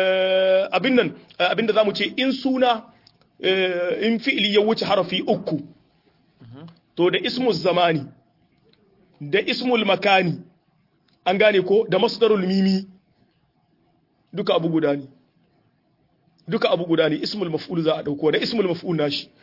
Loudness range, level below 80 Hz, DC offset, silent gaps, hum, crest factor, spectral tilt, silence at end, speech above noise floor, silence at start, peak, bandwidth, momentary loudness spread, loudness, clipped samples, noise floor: 5 LU; -68 dBFS; under 0.1%; none; none; 18 dB; -6.5 dB/octave; 0.2 s; 44 dB; 0 s; -4 dBFS; 5.8 kHz; 9 LU; -21 LUFS; under 0.1%; -64 dBFS